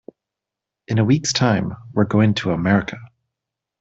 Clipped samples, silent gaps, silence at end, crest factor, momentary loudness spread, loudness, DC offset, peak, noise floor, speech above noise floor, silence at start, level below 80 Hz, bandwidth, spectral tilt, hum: under 0.1%; none; 0.75 s; 18 dB; 8 LU; -19 LUFS; under 0.1%; -2 dBFS; -85 dBFS; 67 dB; 0.9 s; -52 dBFS; 8 kHz; -5.5 dB/octave; none